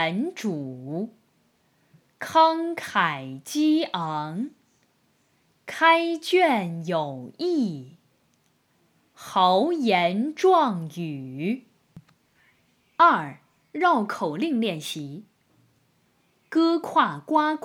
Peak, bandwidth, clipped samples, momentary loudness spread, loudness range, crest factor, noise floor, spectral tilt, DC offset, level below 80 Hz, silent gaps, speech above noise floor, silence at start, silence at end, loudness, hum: -4 dBFS; 16.5 kHz; under 0.1%; 15 LU; 3 LU; 22 dB; -67 dBFS; -5 dB/octave; under 0.1%; -78 dBFS; none; 43 dB; 0 s; 0.05 s; -24 LUFS; none